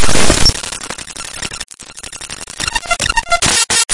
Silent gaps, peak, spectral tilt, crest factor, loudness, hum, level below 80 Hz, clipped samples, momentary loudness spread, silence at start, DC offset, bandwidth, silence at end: none; 0 dBFS; -1.5 dB/octave; 14 dB; -14 LUFS; none; -26 dBFS; under 0.1%; 16 LU; 0 s; under 0.1%; 11.5 kHz; 0 s